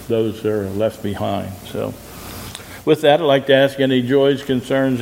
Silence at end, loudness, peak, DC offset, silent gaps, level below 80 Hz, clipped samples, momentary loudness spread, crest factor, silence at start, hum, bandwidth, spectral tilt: 0 s; -18 LUFS; 0 dBFS; under 0.1%; none; -50 dBFS; under 0.1%; 17 LU; 18 dB; 0 s; none; 16 kHz; -6 dB/octave